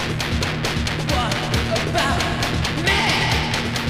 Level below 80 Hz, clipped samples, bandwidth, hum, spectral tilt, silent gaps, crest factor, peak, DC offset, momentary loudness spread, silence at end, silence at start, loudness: -32 dBFS; under 0.1%; 16 kHz; none; -4 dB/octave; none; 12 dB; -8 dBFS; under 0.1%; 5 LU; 0 s; 0 s; -20 LUFS